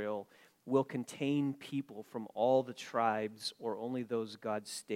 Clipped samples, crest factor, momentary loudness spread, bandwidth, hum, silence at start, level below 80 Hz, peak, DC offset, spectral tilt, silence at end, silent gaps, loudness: under 0.1%; 18 dB; 12 LU; 16 kHz; none; 0 s; -86 dBFS; -18 dBFS; under 0.1%; -5.5 dB/octave; 0 s; none; -36 LUFS